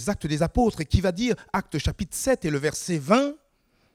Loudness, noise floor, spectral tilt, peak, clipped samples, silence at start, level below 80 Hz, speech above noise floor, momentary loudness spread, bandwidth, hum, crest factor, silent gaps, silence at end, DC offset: -25 LUFS; -66 dBFS; -5.5 dB/octave; -4 dBFS; under 0.1%; 0 s; -38 dBFS; 42 dB; 6 LU; 17.5 kHz; none; 20 dB; none; 0.6 s; under 0.1%